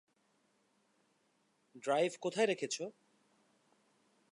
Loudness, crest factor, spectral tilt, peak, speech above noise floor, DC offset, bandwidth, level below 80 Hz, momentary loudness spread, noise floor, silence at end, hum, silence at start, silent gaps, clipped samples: -36 LUFS; 22 dB; -3.5 dB/octave; -20 dBFS; 41 dB; under 0.1%; 11 kHz; under -90 dBFS; 10 LU; -77 dBFS; 1.4 s; none; 1.75 s; none; under 0.1%